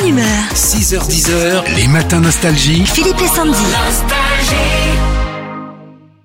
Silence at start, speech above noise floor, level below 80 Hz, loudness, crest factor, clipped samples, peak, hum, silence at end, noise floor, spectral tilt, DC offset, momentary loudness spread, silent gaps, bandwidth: 0 s; 26 dB; -20 dBFS; -12 LUFS; 12 dB; under 0.1%; 0 dBFS; none; 0.35 s; -37 dBFS; -3.5 dB/octave; under 0.1%; 7 LU; none; 16.5 kHz